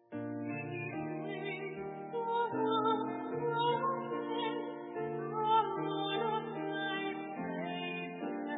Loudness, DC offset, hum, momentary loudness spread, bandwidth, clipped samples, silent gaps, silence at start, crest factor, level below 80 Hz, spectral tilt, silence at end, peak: -36 LUFS; under 0.1%; none; 9 LU; 3.9 kHz; under 0.1%; none; 0.1 s; 18 dB; -82 dBFS; -2 dB/octave; 0 s; -18 dBFS